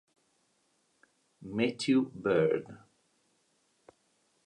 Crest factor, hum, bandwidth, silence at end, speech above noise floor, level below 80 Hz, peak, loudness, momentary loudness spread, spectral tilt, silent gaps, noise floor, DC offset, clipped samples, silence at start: 20 dB; none; 10.5 kHz; 1.7 s; 44 dB; -72 dBFS; -16 dBFS; -30 LUFS; 18 LU; -6 dB/octave; none; -74 dBFS; under 0.1%; under 0.1%; 1.4 s